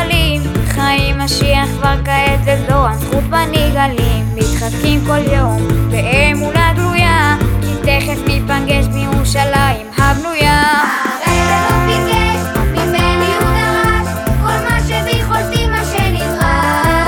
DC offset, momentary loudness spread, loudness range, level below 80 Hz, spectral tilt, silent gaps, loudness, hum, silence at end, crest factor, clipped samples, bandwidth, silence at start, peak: under 0.1%; 4 LU; 1 LU; -20 dBFS; -5 dB/octave; none; -13 LUFS; none; 0 s; 12 dB; under 0.1%; 18.5 kHz; 0 s; 0 dBFS